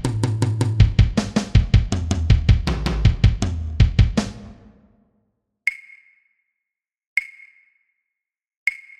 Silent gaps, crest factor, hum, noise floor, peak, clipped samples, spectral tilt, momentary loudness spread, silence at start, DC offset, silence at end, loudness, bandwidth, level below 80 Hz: 7.07-7.16 s, 8.57-8.66 s; 20 dB; none; -85 dBFS; 0 dBFS; under 0.1%; -6 dB/octave; 8 LU; 0 s; under 0.1%; 0.2 s; -20 LUFS; 11 kHz; -24 dBFS